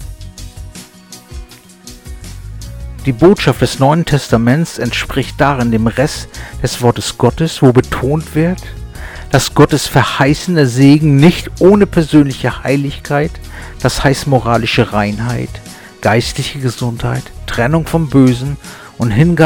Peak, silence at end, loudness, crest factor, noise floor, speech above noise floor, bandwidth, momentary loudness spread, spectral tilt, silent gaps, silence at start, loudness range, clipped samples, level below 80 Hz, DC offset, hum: 0 dBFS; 0 s; -12 LUFS; 12 dB; -36 dBFS; 25 dB; 18.5 kHz; 21 LU; -6 dB/octave; none; 0 s; 6 LU; 0.2%; -30 dBFS; under 0.1%; none